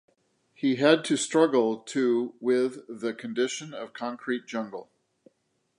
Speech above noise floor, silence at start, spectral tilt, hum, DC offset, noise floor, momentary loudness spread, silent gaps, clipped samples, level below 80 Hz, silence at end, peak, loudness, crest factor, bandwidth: 48 dB; 0.6 s; -4 dB/octave; none; under 0.1%; -74 dBFS; 13 LU; none; under 0.1%; -82 dBFS; 0.95 s; -6 dBFS; -27 LUFS; 22 dB; 11.5 kHz